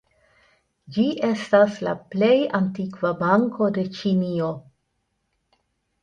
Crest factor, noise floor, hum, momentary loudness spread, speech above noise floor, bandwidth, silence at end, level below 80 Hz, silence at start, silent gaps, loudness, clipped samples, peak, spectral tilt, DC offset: 20 dB; -74 dBFS; none; 9 LU; 52 dB; 9.4 kHz; 1.4 s; -64 dBFS; 0.9 s; none; -22 LUFS; under 0.1%; -4 dBFS; -7.5 dB/octave; under 0.1%